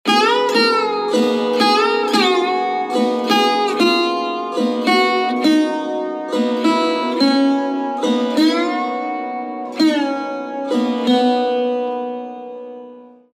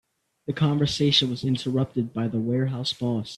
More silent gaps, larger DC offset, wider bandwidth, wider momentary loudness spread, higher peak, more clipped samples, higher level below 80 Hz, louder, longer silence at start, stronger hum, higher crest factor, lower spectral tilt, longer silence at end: neither; neither; first, 14.5 kHz vs 12 kHz; first, 10 LU vs 7 LU; first, -2 dBFS vs -6 dBFS; neither; second, -82 dBFS vs -56 dBFS; first, -17 LUFS vs -24 LUFS; second, 0.05 s vs 0.5 s; neither; about the same, 16 dB vs 18 dB; second, -3.5 dB/octave vs -6 dB/octave; first, 0.3 s vs 0 s